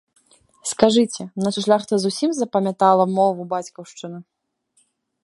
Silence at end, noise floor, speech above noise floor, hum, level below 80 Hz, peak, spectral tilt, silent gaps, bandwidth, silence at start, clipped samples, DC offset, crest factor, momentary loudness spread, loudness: 1 s; -65 dBFS; 45 dB; none; -62 dBFS; 0 dBFS; -5 dB/octave; none; 11.5 kHz; 0.65 s; under 0.1%; under 0.1%; 20 dB; 19 LU; -20 LUFS